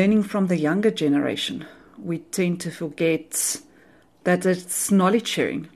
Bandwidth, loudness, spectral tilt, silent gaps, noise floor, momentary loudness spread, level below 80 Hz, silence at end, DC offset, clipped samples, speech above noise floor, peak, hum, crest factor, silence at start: 13 kHz; -23 LUFS; -4.5 dB/octave; none; -55 dBFS; 12 LU; -62 dBFS; 0.1 s; under 0.1%; under 0.1%; 32 dB; -8 dBFS; none; 16 dB; 0 s